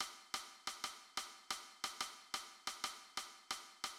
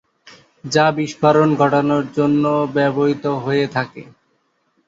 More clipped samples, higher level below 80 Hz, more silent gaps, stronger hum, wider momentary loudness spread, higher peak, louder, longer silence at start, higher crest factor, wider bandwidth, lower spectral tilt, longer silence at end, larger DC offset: neither; second, -80 dBFS vs -58 dBFS; neither; neither; second, 4 LU vs 7 LU; second, -28 dBFS vs -2 dBFS; second, -46 LUFS vs -17 LUFS; second, 0 s vs 0.25 s; about the same, 20 dB vs 16 dB; first, 17 kHz vs 7.8 kHz; second, 1.5 dB/octave vs -6.5 dB/octave; second, 0 s vs 0.85 s; neither